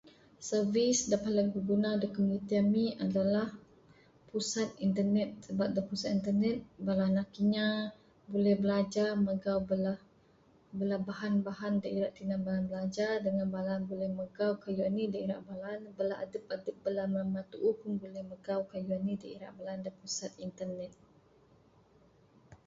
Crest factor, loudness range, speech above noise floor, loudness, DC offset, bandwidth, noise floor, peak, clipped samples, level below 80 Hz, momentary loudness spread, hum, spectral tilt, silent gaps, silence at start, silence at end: 16 dB; 7 LU; 32 dB; -34 LUFS; under 0.1%; 8 kHz; -65 dBFS; -18 dBFS; under 0.1%; -68 dBFS; 11 LU; none; -5.5 dB/octave; none; 0.05 s; 0.1 s